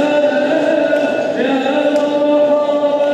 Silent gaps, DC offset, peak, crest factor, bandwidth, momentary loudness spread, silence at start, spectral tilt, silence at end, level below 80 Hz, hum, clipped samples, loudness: none; under 0.1%; -4 dBFS; 10 dB; 8.6 kHz; 3 LU; 0 s; -5 dB/octave; 0 s; -68 dBFS; none; under 0.1%; -14 LUFS